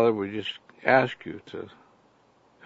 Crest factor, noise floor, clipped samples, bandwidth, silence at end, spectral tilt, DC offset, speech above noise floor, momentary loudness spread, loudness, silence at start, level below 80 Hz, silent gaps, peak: 24 dB; -62 dBFS; under 0.1%; 7.8 kHz; 1 s; -6.5 dB/octave; under 0.1%; 35 dB; 19 LU; -26 LUFS; 0 s; -72 dBFS; none; -4 dBFS